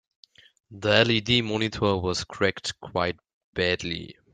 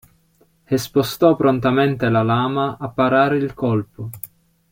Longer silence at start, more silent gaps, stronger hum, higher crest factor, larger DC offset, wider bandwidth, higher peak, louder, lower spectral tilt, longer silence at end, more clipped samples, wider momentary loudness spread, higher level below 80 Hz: about the same, 0.7 s vs 0.7 s; first, 3.33-3.53 s vs none; neither; first, 24 dB vs 18 dB; neither; second, 9.4 kHz vs 16.5 kHz; about the same, -2 dBFS vs -2 dBFS; second, -25 LUFS vs -18 LUFS; second, -4.5 dB/octave vs -6.5 dB/octave; second, 0.2 s vs 0.45 s; neither; second, 13 LU vs 16 LU; about the same, -54 dBFS vs -52 dBFS